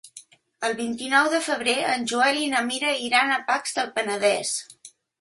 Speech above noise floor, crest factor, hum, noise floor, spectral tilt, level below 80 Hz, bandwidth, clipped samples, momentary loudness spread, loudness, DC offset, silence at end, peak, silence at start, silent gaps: 26 dB; 20 dB; none; -49 dBFS; -1.5 dB/octave; -72 dBFS; 12 kHz; under 0.1%; 8 LU; -23 LUFS; under 0.1%; 0.3 s; -6 dBFS; 0.05 s; none